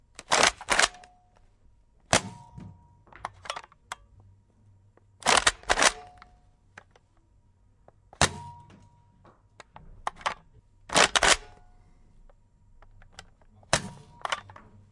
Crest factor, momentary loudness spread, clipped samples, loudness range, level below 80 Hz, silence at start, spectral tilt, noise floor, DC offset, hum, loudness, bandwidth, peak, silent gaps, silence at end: 26 dB; 23 LU; under 0.1%; 8 LU; -52 dBFS; 0.3 s; -1 dB/octave; -62 dBFS; under 0.1%; none; -25 LUFS; 11.5 kHz; -4 dBFS; none; 0.5 s